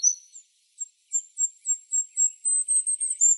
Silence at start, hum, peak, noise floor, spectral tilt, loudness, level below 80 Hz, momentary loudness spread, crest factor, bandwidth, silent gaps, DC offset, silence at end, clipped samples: 0 s; none; -10 dBFS; -52 dBFS; 12.5 dB/octave; -23 LUFS; under -90 dBFS; 15 LU; 16 dB; 11.5 kHz; none; under 0.1%; 0 s; under 0.1%